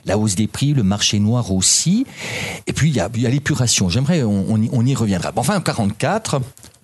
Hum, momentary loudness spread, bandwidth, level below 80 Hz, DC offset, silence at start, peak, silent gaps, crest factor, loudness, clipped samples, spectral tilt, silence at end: none; 8 LU; 12.5 kHz; -46 dBFS; under 0.1%; 0.05 s; -2 dBFS; none; 16 dB; -18 LUFS; under 0.1%; -4.5 dB/octave; 0.15 s